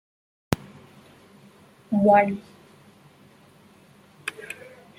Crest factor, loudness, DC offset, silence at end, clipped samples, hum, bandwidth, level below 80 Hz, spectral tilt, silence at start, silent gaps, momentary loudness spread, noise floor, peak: 28 dB; -24 LUFS; under 0.1%; 0.45 s; under 0.1%; none; 16.5 kHz; -60 dBFS; -6.5 dB/octave; 0.5 s; none; 21 LU; -54 dBFS; 0 dBFS